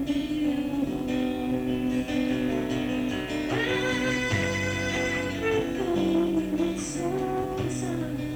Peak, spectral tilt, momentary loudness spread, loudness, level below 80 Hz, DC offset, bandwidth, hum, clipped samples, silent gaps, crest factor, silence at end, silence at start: -14 dBFS; -5 dB/octave; 4 LU; -27 LUFS; -46 dBFS; under 0.1%; over 20 kHz; none; under 0.1%; none; 14 dB; 0 s; 0 s